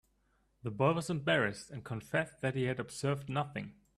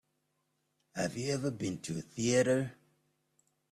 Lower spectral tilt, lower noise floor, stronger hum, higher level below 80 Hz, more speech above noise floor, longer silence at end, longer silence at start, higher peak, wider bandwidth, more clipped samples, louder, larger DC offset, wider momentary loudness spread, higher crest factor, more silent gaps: about the same, -5.5 dB/octave vs -5 dB/octave; second, -74 dBFS vs -80 dBFS; neither; about the same, -66 dBFS vs -70 dBFS; second, 40 dB vs 47 dB; second, 0.25 s vs 1 s; second, 0.65 s vs 0.95 s; about the same, -16 dBFS vs -16 dBFS; second, 12.5 kHz vs 14 kHz; neither; about the same, -35 LUFS vs -34 LUFS; neither; about the same, 13 LU vs 12 LU; about the same, 20 dB vs 20 dB; neither